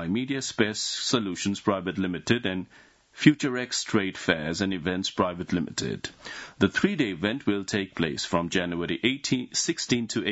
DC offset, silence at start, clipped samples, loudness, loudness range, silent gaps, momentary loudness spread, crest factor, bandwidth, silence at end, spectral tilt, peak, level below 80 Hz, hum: under 0.1%; 0 s; under 0.1%; -27 LUFS; 2 LU; none; 6 LU; 24 dB; 8 kHz; 0 s; -4 dB/octave; -2 dBFS; -60 dBFS; none